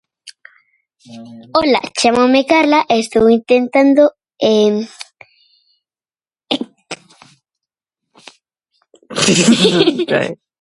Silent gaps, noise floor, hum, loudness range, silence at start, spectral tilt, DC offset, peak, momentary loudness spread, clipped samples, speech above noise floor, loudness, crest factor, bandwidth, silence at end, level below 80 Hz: none; under -90 dBFS; none; 17 LU; 0.25 s; -4 dB/octave; under 0.1%; 0 dBFS; 20 LU; under 0.1%; over 77 dB; -13 LUFS; 16 dB; 11.5 kHz; 0.25 s; -54 dBFS